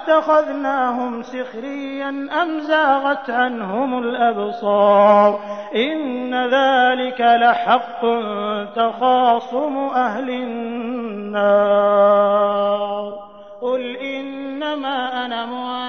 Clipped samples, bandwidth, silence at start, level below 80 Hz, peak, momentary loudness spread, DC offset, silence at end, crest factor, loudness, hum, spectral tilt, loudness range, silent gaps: under 0.1%; 6.4 kHz; 0 s; -66 dBFS; -2 dBFS; 13 LU; 0.3%; 0 s; 16 dB; -18 LUFS; none; -6 dB/octave; 4 LU; none